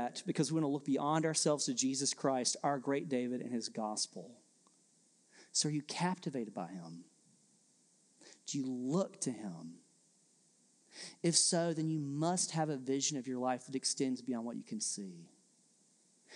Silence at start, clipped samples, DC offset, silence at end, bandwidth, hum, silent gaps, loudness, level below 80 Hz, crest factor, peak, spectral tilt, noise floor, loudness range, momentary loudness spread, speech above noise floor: 0 s; under 0.1%; under 0.1%; 0 s; 12 kHz; none; none; -36 LUFS; under -90 dBFS; 22 dB; -16 dBFS; -3.5 dB/octave; -71 dBFS; 8 LU; 17 LU; 34 dB